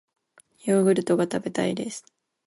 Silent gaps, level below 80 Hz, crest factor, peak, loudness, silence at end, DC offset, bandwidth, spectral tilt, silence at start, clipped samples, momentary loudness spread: none; -68 dBFS; 16 dB; -8 dBFS; -25 LUFS; 0.45 s; under 0.1%; 11.5 kHz; -6 dB/octave; 0.65 s; under 0.1%; 14 LU